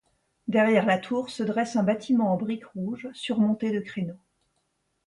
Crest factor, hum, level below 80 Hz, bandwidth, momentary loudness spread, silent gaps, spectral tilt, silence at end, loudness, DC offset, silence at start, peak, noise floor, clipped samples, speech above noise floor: 18 dB; none; -70 dBFS; 11 kHz; 12 LU; none; -6.5 dB/octave; 0.9 s; -26 LUFS; under 0.1%; 0.45 s; -8 dBFS; -74 dBFS; under 0.1%; 49 dB